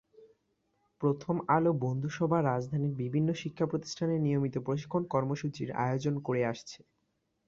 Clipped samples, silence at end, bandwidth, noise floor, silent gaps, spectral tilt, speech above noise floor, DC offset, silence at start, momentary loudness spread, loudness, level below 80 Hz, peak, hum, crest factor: under 0.1%; 0.7 s; 7.6 kHz; -78 dBFS; none; -7.5 dB/octave; 48 dB; under 0.1%; 0.2 s; 6 LU; -32 LUFS; -68 dBFS; -12 dBFS; none; 20 dB